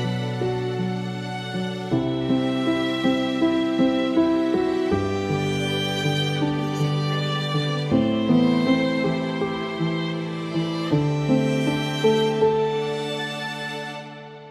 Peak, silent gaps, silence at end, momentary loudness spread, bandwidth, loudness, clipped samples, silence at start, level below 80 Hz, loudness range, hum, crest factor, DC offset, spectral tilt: -8 dBFS; none; 0 s; 8 LU; 13 kHz; -23 LUFS; under 0.1%; 0 s; -54 dBFS; 2 LU; none; 14 dB; under 0.1%; -6.5 dB/octave